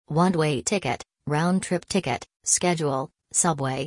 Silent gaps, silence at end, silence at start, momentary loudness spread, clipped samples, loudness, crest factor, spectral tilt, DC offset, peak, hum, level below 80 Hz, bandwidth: none; 0 s; 0.1 s; 8 LU; under 0.1%; -24 LUFS; 18 dB; -4 dB/octave; under 0.1%; -6 dBFS; none; -58 dBFS; 11.5 kHz